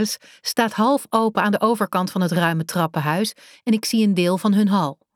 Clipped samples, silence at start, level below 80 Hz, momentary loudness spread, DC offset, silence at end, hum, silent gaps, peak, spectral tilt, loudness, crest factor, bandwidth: under 0.1%; 0 s; -72 dBFS; 6 LU; under 0.1%; 0.2 s; none; none; -4 dBFS; -5.5 dB/octave; -20 LUFS; 16 dB; 17.5 kHz